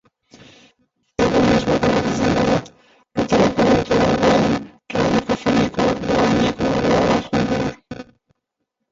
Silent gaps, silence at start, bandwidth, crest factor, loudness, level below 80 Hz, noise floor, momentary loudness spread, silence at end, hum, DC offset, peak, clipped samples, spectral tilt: none; 1.2 s; 7.8 kHz; 16 dB; -18 LUFS; -40 dBFS; -77 dBFS; 10 LU; 0.9 s; none; under 0.1%; -2 dBFS; under 0.1%; -6 dB/octave